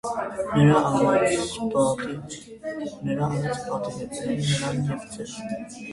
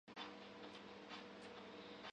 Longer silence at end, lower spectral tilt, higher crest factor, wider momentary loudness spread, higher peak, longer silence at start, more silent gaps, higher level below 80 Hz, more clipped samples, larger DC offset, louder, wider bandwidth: about the same, 0 s vs 0 s; first, -6 dB/octave vs -4 dB/octave; about the same, 18 dB vs 16 dB; first, 15 LU vs 2 LU; first, -6 dBFS vs -38 dBFS; about the same, 0.05 s vs 0.05 s; neither; first, -54 dBFS vs -84 dBFS; neither; neither; first, -25 LUFS vs -55 LUFS; first, 11.5 kHz vs 9.6 kHz